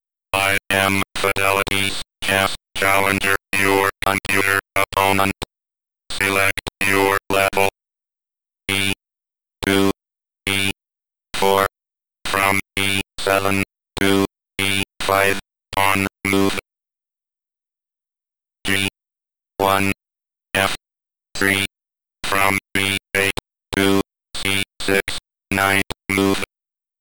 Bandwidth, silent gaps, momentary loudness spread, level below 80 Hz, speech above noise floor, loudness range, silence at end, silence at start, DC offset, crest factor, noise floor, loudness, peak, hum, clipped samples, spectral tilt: 18 kHz; none; 10 LU; -48 dBFS; 69 dB; 5 LU; 0 s; 0 s; 1%; 18 dB; -87 dBFS; -19 LUFS; -2 dBFS; none; under 0.1%; -3.5 dB/octave